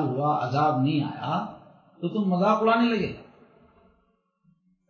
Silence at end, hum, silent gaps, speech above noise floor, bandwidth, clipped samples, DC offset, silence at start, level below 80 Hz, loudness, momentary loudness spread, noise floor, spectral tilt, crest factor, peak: 1.65 s; none; none; 45 dB; 6.8 kHz; under 0.1%; under 0.1%; 0 s; -62 dBFS; -25 LUFS; 12 LU; -69 dBFS; -8 dB/octave; 18 dB; -8 dBFS